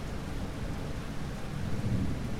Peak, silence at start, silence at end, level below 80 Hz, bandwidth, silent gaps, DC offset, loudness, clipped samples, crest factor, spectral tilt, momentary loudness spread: -20 dBFS; 0 s; 0 s; -40 dBFS; 16 kHz; none; under 0.1%; -36 LUFS; under 0.1%; 12 dB; -6.5 dB/octave; 6 LU